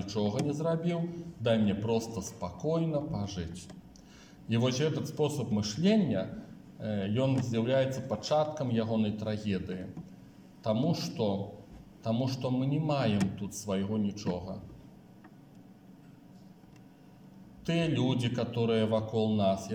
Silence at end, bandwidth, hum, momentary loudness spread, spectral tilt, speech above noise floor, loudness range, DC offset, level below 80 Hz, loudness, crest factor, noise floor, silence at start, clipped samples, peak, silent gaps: 0 s; 16 kHz; none; 13 LU; -6.5 dB/octave; 24 dB; 7 LU; under 0.1%; -62 dBFS; -31 LUFS; 18 dB; -55 dBFS; 0 s; under 0.1%; -14 dBFS; none